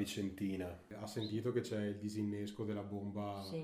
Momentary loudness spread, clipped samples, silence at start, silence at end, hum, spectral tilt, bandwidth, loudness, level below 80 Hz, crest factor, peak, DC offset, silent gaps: 6 LU; under 0.1%; 0 s; 0 s; none; -6 dB/octave; 15.5 kHz; -42 LUFS; -70 dBFS; 16 dB; -24 dBFS; under 0.1%; none